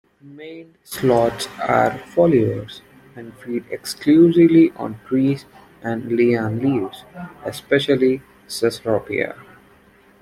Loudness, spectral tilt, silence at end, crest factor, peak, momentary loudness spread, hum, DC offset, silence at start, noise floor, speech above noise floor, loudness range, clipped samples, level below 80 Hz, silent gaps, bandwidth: -18 LUFS; -6.5 dB/octave; 0.9 s; 18 dB; -2 dBFS; 23 LU; none; under 0.1%; 0.25 s; -52 dBFS; 33 dB; 4 LU; under 0.1%; -56 dBFS; none; 15 kHz